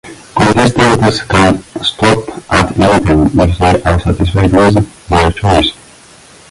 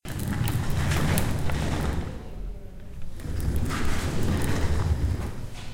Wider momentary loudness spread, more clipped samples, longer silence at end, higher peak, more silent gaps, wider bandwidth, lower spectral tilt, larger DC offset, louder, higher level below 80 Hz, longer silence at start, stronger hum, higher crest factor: second, 5 LU vs 14 LU; neither; first, 0.75 s vs 0 s; first, 0 dBFS vs -4 dBFS; neither; second, 11.5 kHz vs 17 kHz; about the same, -5.5 dB/octave vs -5.5 dB/octave; neither; first, -10 LUFS vs -28 LUFS; first, -24 dBFS vs -32 dBFS; about the same, 0.05 s vs 0.05 s; neither; second, 10 dB vs 22 dB